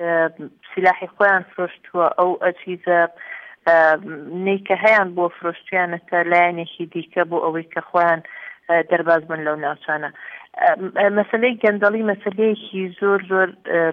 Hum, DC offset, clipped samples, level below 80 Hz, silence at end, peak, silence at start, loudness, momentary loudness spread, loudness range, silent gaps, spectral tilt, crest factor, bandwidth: none; under 0.1%; under 0.1%; -70 dBFS; 0 s; -2 dBFS; 0 s; -19 LUFS; 12 LU; 2 LU; none; -7.5 dB/octave; 16 dB; 6.2 kHz